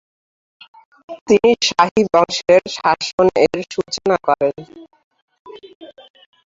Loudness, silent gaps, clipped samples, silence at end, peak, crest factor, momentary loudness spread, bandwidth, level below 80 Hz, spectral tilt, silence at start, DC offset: -16 LUFS; 1.21-1.26 s, 1.91-1.95 s, 3.13-3.18 s, 5.04-5.11 s, 5.22-5.28 s, 5.39-5.45 s, 5.75-5.81 s; under 0.1%; 0.6 s; -2 dBFS; 16 dB; 10 LU; 7.8 kHz; -54 dBFS; -4 dB/octave; 1.1 s; under 0.1%